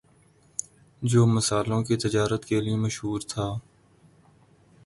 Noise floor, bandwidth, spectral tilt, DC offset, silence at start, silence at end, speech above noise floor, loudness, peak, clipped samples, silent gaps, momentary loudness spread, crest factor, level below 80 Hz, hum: -59 dBFS; 11.5 kHz; -5.5 dB/octave; under 0.1%; 0.6 s; 1.25 s; 35 dB; -26 LUFS; -8 dBFS; under 0.1%; none; 14 LU; 18 dB; -54 dBFS; none